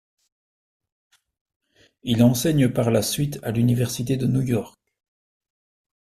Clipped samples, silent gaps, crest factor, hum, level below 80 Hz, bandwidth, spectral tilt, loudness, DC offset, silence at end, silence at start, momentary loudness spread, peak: under 0.1%; none; 20 dB; none; -52 dBFS; 14.5 kHz; -6 dB/octave; -22 LUFS; under 0.1%; 1.35 s; 2.05 s; 8 LU; -4 dBFS